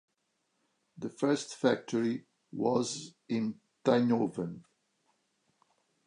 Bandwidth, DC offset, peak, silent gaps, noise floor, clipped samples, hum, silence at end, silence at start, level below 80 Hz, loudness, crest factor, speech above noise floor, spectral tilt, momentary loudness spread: 10.5 kHz; under 0.1%; -14 dBFS; none; -79 dBFS; under 0.1%; none; 1.45 s; 0.95 s; -78 dBFS; -32 LUFS; 20 dB; 48 dB; -5.5 dB/octave; 14 LU